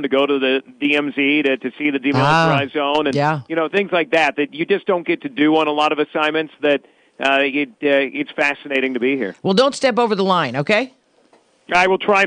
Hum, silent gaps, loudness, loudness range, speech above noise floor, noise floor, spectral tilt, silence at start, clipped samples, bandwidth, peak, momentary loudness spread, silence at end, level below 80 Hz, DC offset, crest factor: none; none; -18 LUFS; 2 LU; 38 dB; -55 dBFS; -5.5 dB/octave; 0 s; under 0.1%; 10 kHz; -4 dBFS; 5 LU; 0 s; -60 dBFS; under 0.1%; 14 dB